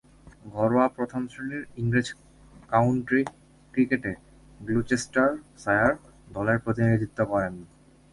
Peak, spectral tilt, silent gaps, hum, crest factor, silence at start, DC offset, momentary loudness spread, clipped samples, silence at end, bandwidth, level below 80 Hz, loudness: -6 dBFS; -7 dB/octave; none; none; 20 dB; 0.25 s; under 0.1%; 13 LU; under 0.1%; 0.45 s; 11.5 kHz; -52 dBFS; -26 LUFS